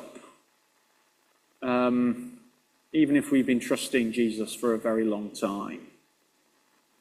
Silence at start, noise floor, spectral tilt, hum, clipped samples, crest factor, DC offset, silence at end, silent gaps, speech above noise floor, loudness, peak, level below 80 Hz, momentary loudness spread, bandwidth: 0 s; -68 dBFS; -5 dB/octave; none; under 0.1%; 18 dB; under 0.1%; 1.15 s; none; 42 dB; -27 LUFS; -10 dBFS; -70 dBFS; 13 LU; 15 kHz